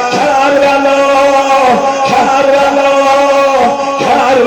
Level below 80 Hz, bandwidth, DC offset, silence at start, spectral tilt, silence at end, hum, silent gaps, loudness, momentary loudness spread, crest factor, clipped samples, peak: -44 dBFS; 12.5 kHz; under 0.1%; 0 s; -3.5 dB/octave; 0 s; none; none; -8 LUFS; 2 LU; 8 dB; under 0.1%; -2 dBFS